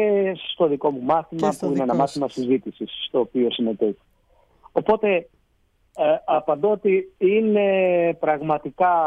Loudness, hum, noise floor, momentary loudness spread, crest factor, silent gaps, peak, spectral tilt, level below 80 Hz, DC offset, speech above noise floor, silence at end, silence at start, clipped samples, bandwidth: -22 LUFS; none; -64 dBFS; 7 LU; 16 dB; none; -6 dBFS; -6.5 dB/octave; -60 dBFS; under 0.1%; 43 dB; 0 s; 0 s; under 0.1%; 11.5 kHz